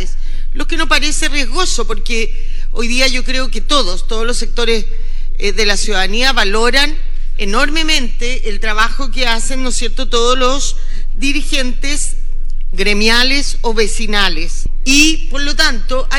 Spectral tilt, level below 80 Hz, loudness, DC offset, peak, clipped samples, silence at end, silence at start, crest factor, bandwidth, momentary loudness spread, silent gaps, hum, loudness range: -2.5 dB/octave; -14 dBFS; -15 LUFS; under 0.1%; 0 dBFS; 0.2%; 0 s; 0 s; 10 dB; 12 kHz; 13 LU; none; none; 3 LU